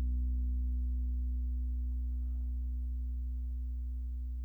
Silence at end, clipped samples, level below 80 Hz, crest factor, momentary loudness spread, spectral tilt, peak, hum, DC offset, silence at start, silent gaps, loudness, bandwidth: 0 s; under 0.1%; -34 dBFS; 8 dB; 5 LU; -11 dB/octave; -28 dBFS; 60 Hz at -75 dBFS; under 0.1%; 0 s; none; -38 LUFS; 0.5 kHz